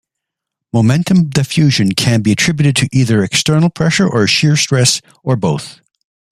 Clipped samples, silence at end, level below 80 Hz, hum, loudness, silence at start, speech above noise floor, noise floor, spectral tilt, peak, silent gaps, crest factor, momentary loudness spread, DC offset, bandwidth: under 0.1%; 0.6 s; -46 dBFS; none; -13 LUFS; 0.75 s; 67 dB; -80 dBFS; -4.5 dB/octave; 0 dBFS; none; 14 dB; 7 LU; under 0.1%; 14.5 kHz